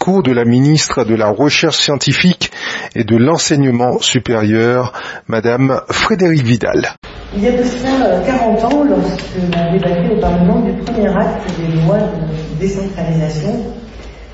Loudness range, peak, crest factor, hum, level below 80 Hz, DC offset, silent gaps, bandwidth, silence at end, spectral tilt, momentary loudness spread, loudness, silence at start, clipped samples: 3 LU; 0 dBFS; 14 dB; none; -34 dBFS; under 0.1%; 6.97-7.02 s; 8 kHz; 0 s; -5.5 dB/octave; 8 LU; -13 LUFS; 0 s; under 0.1%